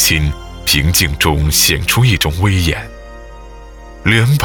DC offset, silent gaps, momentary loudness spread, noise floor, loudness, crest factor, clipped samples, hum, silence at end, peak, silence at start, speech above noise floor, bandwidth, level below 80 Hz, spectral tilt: under 0.1%; none; 10 LU; -33 dBFS; -13 LUFS; 14 dB; under 0.1%; 50 Hz at -30 dBFS; 0 s; 0 dBFS; 0 s; 20 dB; over 20 kHz; -24 dBFS; -3.5 dB/octave